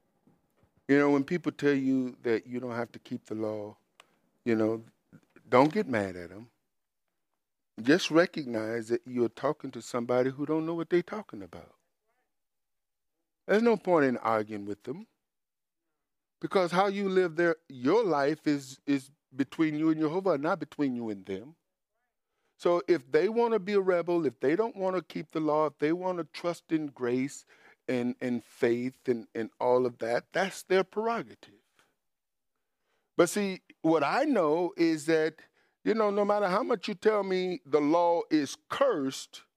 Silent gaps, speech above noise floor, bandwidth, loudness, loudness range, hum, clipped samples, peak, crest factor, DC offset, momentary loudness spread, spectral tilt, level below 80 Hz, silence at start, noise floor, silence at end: none; over 61 dB; 15 kHz; -29 LUFS; 4 LU; none; under 0.1%; -8 dBFS; 22 dB; under 0.1%; 12 LU; -6 dB/octave; -78 dBFS; 0.9 s; under -90 dBFS; 0.15 s